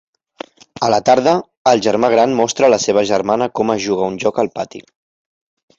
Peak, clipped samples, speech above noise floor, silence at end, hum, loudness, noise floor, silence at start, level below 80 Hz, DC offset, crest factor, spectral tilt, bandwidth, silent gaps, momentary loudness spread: -2 dBFS; under 0.1%; 21 dB; 1 s; none; -15 LUFS; -36 dBFS; 0.8 s; -56 dBFS; under 0.1%; 14 dB; -4 dB/octave; 8 kHz; 1.57-1.65 s; 15 LU